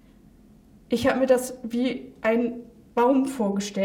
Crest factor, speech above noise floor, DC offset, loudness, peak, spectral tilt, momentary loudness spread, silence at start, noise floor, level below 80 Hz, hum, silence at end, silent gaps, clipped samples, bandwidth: 18 dB; 29 dB; under 0.1%; -24 LUFS; -8 dBFS; -5 dB/octave; 9 LU; 0.9 s; -53 dBFS; -58 dBFS; none; 0 s; none; under 0.1%; 17.5 kHz